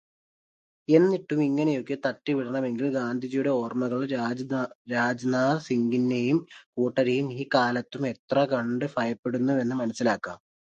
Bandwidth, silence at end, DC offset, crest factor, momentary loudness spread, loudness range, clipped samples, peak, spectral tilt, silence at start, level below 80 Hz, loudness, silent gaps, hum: 8.6 kHz; 0.25 s; under 0.1%; 20 dB; 6 LU; 2 LU; under 0.1%; -6 dBFS; -6.5 dB/octave; 0.9 s; -72 dBFS; -26 LUFS; 4.75-4.85 s, 6.66-6.73 s, 8.19-8.28 s, 9.19-9.23 s; none